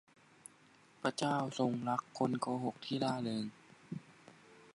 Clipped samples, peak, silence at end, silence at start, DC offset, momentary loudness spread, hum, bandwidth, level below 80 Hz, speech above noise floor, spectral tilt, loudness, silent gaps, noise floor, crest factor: under 0.1%; -18 dBFS; 0.05 s; 1 s; under 0.1%; 18 LU; none; 11.5 kHz; -82 dBFS; 28 dB; -5.5 dB/octave; -37 LUFS; none; -65 dBFS; 22 dB